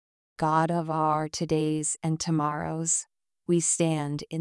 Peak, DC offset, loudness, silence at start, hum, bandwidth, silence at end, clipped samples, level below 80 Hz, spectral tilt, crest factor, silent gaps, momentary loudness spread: -12 dBFS; under 0.1%; -27 LUFS; 0.4 s; none; 12 kHz; 0 s; under 0.1%; -62 dBFS; -4.5 dB/octave; 16 dB; none; 6 LU